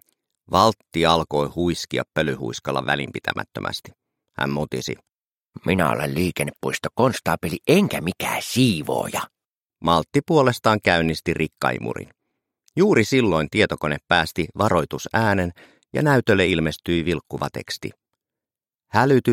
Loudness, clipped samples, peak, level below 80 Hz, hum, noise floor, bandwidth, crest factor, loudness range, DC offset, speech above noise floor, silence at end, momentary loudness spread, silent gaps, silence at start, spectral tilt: -22 LUFS; under 0.1%; -2 dBFS; -48 dBFS; none; under -90 dBFS; 16.5 kHz; 20 dB; 5 LU; under 0.1%; over 69 dB; 0 s; 11 LU; 5.24-5.41 s, 9.47-9.51 s, 9.58-9.69 s; 0.5 s; -5.5 dB/octave